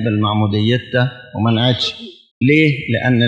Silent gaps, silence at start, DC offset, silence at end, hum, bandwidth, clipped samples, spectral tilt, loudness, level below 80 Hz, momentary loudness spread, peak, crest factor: 2.31-2.41 s; 0 s; under 0.1%; 0 s; none; 8 kHz; under 0.1%; -7 dB/octave; -16 LUFS; -54 dBFS; 8 LU; 0 dBFS; 16 dB